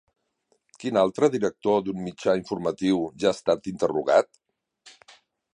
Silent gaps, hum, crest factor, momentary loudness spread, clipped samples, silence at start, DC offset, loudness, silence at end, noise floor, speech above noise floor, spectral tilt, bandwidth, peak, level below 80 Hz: none; none; 20 dB; 7 LU; under 0.1%; 0.8 s; under 0.1%; -25 LUFS; 0.65 s; -71 dBFS; 47 dB; -5.5 dB/octave; 11 kHz; -6 dBFS; -62 dBFS